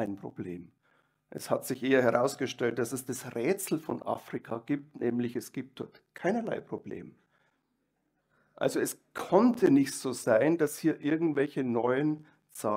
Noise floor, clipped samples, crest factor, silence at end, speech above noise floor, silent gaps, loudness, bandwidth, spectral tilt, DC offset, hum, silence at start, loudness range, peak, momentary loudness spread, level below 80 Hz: -78 dBFS; under 0.1%; 22 dB; 0 s; 48 dB; none; -30 LUFS; 16 kHz; -5.5 dB/octave; under 0.1%; none; 0 s; 9 LU; -8 dBFS; 16 LU; -76 dBFS